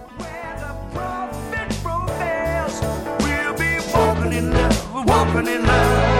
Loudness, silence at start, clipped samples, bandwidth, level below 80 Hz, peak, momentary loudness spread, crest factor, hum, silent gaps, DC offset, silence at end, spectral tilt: -20 LUFS; 0 s; under 0.1%; 17 kHz; -28 dBFS; -2 dBFS; 13 LU; 18 dB; none; none; under 0.1%; 0 s; -5.5 dB/octave